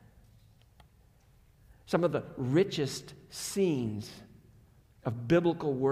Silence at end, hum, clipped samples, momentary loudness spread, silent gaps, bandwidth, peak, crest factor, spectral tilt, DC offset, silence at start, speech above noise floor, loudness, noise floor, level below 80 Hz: 0 s; none; under 0.1%; 15 LU; none; 15.5 kHz; -12 dBFS; 20 dB; -6 dB/octave; under 0.1%; 1.85 s; 32 dB; -31 LUFS; -62 dBFS; -62 dBFS